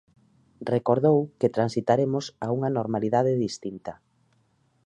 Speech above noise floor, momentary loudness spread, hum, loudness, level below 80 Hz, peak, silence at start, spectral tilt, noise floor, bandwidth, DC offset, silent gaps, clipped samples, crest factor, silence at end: 42 dB; 14 LU; none; -25 LUFS; -66 dBFS; -8 dBFS; 0.6 s; -7 dB/octave; -67 dBFS; 10.5 kHz; under 0.1%; none; under 0.1%; 18 dB; 0.95 s